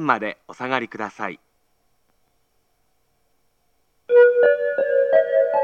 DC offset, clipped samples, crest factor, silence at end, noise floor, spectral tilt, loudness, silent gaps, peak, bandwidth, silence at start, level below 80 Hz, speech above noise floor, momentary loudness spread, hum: under 0.1%; under 0.1%; 20 dB; 0 s; -68 dBFS; -6 dB/octave; -19 LUFS; none; -2 dBFS; 6.8 kHz; 0 s; -74 dBFS; 42 dB; 16 LU; none